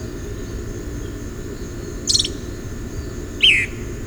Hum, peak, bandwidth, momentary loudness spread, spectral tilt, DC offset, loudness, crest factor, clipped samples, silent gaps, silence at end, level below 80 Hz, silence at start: none; -2 dBFS; over 20 kHz; 18 LU; -2 dB/octave; under 0.1%; -20 LUFS; 22 dB; under 0.1%; none; 0 s; -34 dBFS; 0 s